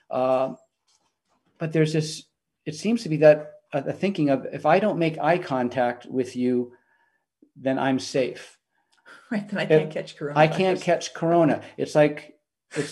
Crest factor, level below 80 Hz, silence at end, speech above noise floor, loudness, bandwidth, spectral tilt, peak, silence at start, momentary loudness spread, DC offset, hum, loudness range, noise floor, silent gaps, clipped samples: 20 dB; -72 dBFS; 0 s; 48 dB; -24 LUFS; 12 kHz; -6 dB/octave; -4 dBFS; 0.1 s; 12 LU; under 0.1%; none; 5 LU; -71 dBFS; none; under 0.1%